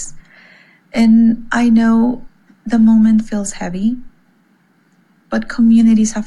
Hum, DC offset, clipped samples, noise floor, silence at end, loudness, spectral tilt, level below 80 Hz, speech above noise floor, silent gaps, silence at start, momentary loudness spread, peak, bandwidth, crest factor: none; under 0.1%; under 0.1%; -55 dBFS; 0 s; -13 LUFS; -5.5 dB/octave; -38 dBFS; 43 dB; none; 0 s; 13 LU; -4 dBFS; 11 kHz; 10 dB